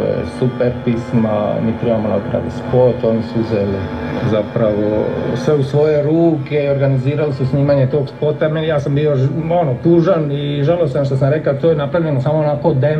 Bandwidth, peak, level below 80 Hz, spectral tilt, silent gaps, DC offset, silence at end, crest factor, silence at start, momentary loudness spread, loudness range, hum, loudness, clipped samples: 8.8 kHz; 0 dBFS; -44 dBFS; -9 dB/octave; none; 0.2%; 0 s; 14 dB; 0 s; 5 LU; 2 LU; none; -16 LUFS; under 0.1%